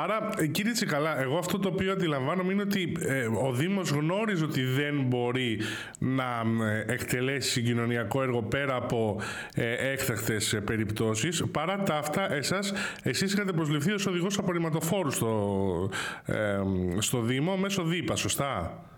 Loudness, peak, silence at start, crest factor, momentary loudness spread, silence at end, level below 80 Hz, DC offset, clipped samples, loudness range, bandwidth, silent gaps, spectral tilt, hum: -29 LUFS; -16 dBFS; 0 s; 14 dB; 3 LU; 0 s; -58 dBFS; under 0.1%; under 0.1%; 1 LU; 18 kHz; none; -5 dB/octave; none